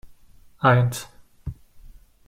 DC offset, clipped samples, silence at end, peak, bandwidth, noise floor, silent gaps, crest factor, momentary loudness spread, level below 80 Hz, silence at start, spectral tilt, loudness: under 0.1%; under 0.1%; 0.4 s; -4 dBFS; 15.5 kHz; -50 dBFS; none; 22 dB; 21 LU; -48 dBFS; 0.05 s; -6 dB/octave; -21 LUFS